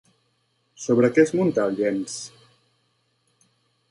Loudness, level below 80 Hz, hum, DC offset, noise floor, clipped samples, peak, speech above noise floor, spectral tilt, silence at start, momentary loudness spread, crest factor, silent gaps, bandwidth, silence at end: -22 LUFS; -68 dBFS; none; under 0.1%; -69 dBFS; under 0.1%; -4 dBFS; 48 dB; -6 dB/octave; 0.8 s; 16 LU; 20 dB; none; 11.5 kHz; 1.65 s